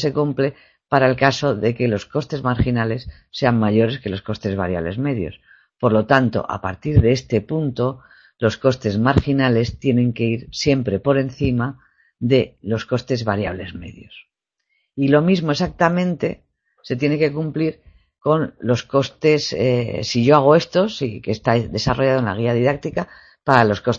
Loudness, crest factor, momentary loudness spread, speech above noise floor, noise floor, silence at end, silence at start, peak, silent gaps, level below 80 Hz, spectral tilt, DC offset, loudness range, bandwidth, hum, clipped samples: -19 LUFS; 20 dB; 10 LU; 52 dB; -71 dBFS; 0 s; 0 s; 0 dBFS; none; -40 dBFS; -6.5 dB/octave; under 0.1%; 4 LU; 7.6 kHz; none; under 0.1%